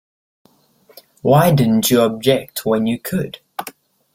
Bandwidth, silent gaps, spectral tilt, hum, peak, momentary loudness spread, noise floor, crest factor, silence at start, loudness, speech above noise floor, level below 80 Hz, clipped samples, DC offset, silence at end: 16.5 kHz; none; -5.5 dB/octave; none; -2 dBFS; 17 LU; -54 dBFS; 16 dB; 1.25 s; -16 LUFS; 38 dB; -52 dBFS; under 0.1%; under 0.1%; 0.45 s